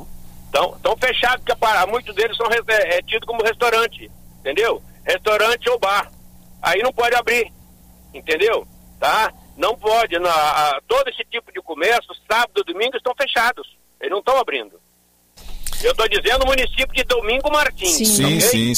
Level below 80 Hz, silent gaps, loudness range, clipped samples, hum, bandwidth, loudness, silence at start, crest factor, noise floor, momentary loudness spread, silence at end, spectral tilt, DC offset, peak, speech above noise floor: -36 dBFS; none; 3 LU; under 0.1%; none; 16 kHz; -18 LUFS; 0 s; 16 dB; -58 dBFS; 9 LU; 0 s; -2.5 dB/octave; under 0.1%; -4 dBFS; 39 dB